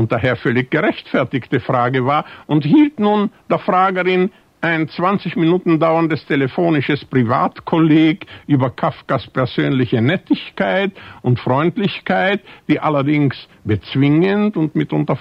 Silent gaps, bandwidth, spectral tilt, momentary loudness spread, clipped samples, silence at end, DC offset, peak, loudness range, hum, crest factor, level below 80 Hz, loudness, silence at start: none; 5.6 kHz; -9 dB/octave; 7 LU; under 0.1%; 0 s; under 0.1%; -2 dBFS; 2 LU; none; 14 dB; -54 dBFS; -17 LUFS; 0 s